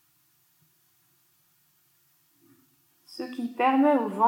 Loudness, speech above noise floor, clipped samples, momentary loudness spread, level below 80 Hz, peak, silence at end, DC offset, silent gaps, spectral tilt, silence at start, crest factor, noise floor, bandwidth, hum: -25 LUFS; 43 dB; under 0.1%; 18 LU; under -90 dBFS; -10 dBFS; 0 s; under 0.1%; none; -6 dB/octave; 3.1 s; 20 dB; -67 dBFS; 17 kHz; none